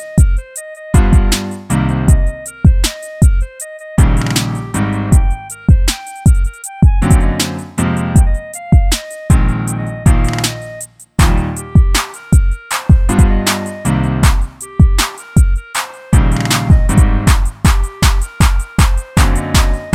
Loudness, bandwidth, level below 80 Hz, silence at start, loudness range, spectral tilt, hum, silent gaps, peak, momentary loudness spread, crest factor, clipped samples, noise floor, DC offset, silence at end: -14 LUFS; 16 kHz; -14 dBFS; 0 s; 2 LU; -5 dB/octave; none; none; 0 dBFS; 7 LU; 12 dB; under 0.1%; -31 dBFS; under 0.1%; 0 s